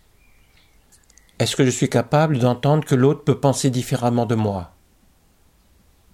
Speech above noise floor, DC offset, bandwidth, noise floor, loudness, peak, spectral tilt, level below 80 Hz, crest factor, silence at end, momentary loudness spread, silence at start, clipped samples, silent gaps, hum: 38 dB; under 0.1%; 15.5 kHz; -57 dBFS; -19 LUFS; -4 dBFS; -6 dB/octave; -54 dBFS; 16 dB; 1.5 s; 6 LU; 1.4 s; under 0.1%; none; none